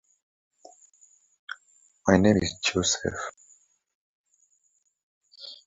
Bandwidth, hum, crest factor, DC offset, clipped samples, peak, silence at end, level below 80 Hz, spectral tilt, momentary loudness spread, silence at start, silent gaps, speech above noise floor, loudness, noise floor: 8 kHz; none; 24 dB; under 0.1%; under 0.1%; -6 dBFS; 0.15 s; -50 dBFS; -4 dB/octave; 23 LU; 1.5 s; 3.94-4.24 s, 5.03-5.21 s; 47 dB; -24 LUFS; -71 dBFS